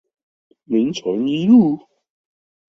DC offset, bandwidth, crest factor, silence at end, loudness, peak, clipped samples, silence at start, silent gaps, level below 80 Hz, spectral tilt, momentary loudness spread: under 0.1%; 7 kHz; 16 dB; 0.95 s; -17 LUFS; -2 dBFS; under 0.1%; 0.7 s; none; -62 dBFS; -7 dB/octave; 9 LU